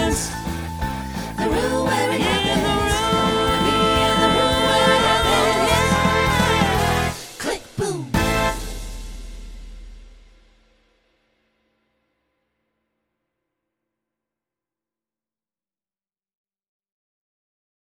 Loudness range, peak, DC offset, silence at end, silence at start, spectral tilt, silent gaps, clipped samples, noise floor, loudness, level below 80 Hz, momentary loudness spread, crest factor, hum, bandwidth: 10 LU; -4 dBFS; under 0.1%; 7.9 s; 0 s; -4 dB/octave; none; under 0.1%; under -90 dBFS; -19 LUFS; -34 dBFS; 12 LU; 18 dB; none; over 20 kHz